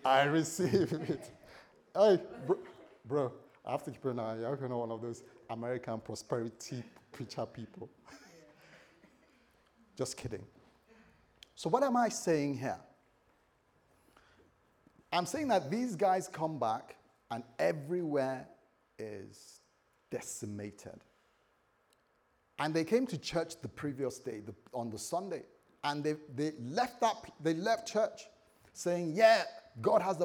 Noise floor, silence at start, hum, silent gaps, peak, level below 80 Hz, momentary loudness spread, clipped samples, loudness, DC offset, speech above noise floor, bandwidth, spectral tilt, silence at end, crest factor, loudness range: -73 dBFS; 0 s; none; none; -12 dBFS; -74 dBFS; 17 LU; under 0.1%; -35 LUFS; under 0.1%; 39 dB; 19.5 kHz; -5 dB/octave; 0 s; 24 dB; 13 LU